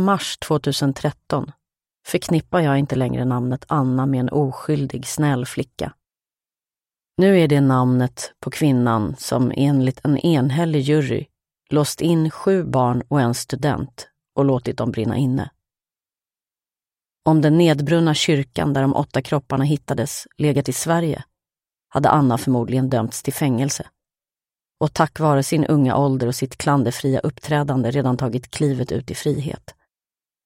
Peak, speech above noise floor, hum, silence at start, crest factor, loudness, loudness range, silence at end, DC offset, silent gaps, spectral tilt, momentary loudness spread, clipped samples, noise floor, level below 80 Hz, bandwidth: 0 dBFS; over 71 dB; none; 0 s; 20 dB; -20 LUFS; 4 LU; 0.75 s; under 0.1%; none; -6 dB/octave; 9 LU; under 0.1%; under -90 dBFS; -52 dBFS; 16.5 kHz